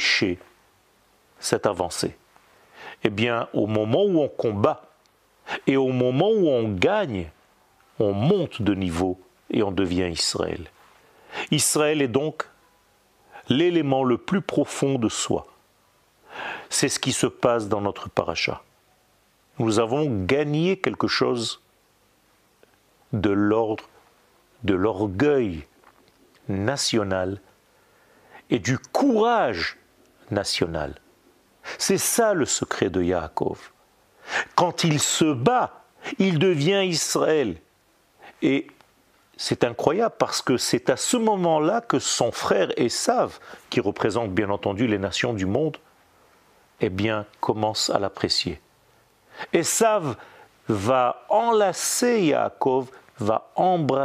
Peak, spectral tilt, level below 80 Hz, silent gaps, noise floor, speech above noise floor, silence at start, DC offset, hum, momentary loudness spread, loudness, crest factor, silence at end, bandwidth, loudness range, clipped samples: 0 dBFS; -4.5 dB/octave; -56 dBFS; none; -62 dBFS; 40 dB; 0 s; under 0.1%; none; 11 LU; -23 LUFS; 24 dB; 0 s; 15.5 kHz; 4 LU; under 0.1%